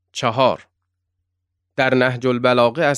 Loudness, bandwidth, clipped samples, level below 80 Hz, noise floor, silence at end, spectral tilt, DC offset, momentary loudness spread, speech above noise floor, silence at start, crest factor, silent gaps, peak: -18 LUFS; 12 kHz; under 0.1%; -64 dBFS; -76 dBFS; 0 s; -5.5 dB/octave; under 0.1%; 9 LU; 59 dB; 0.15 s; 18 dB; none; -2 dBFS